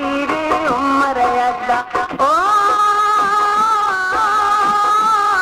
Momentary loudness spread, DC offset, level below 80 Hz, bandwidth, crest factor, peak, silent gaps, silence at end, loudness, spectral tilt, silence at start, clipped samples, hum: 5 LU; under 0.1%; -48 dBFS; 15.5 kHz; 12 dB; -4 dBFS; none; 0 s; -15 LUFS; -3 dB/octave; 0 s; under 0.1%; none